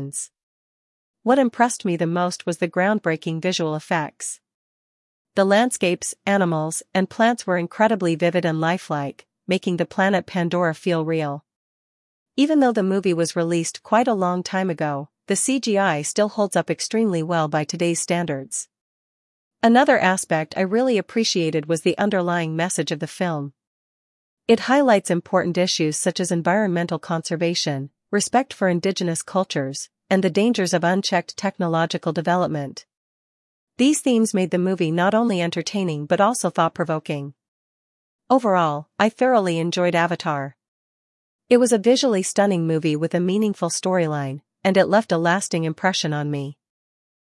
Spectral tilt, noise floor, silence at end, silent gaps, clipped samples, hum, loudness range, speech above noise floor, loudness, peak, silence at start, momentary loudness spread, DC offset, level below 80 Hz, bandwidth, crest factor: -4.5 dB/octave; under -90 dBFS; 0.7 s; 0.43-1.14 s, 4.54-5.25 s, 11.56-12.26 s, 18.81-19.51 s, 23.67-24.37 s, 32.97-33.67 s, 37.48-38.19 s, 40.68-41.39 s; under 0.1%; none; 3 LU; over 70 dB; -21 LUFS; -2 dBFS; 0 s; 9 LU; under 0.1%; -72 dBFS; 12 kHz; 20 dB